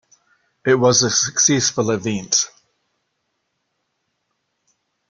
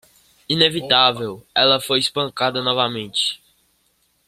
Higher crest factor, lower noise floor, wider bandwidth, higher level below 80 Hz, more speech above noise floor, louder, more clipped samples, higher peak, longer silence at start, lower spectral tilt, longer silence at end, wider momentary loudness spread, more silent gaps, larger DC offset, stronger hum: about the same, 20 dB vs 20 dB; first, -73 dBFS vs -64 dBFS; second, 11 kHz vs 16 kHz; about the same, -58 dBFS vs -60 dBFS; first, 56 dB vs 45 dB; about the same, -17 LUFS vs -18 LUFS; neither; about the same, -2 dBFS vs 0 dBFS; first, 0.65 s vs 0.5 s; about the same, -2.5 dB/octave vs -3.5 dB/octave; first, 2.65 s vs 0.9 s; about the same, 9 LU vs 8 LU; neither; neither; neither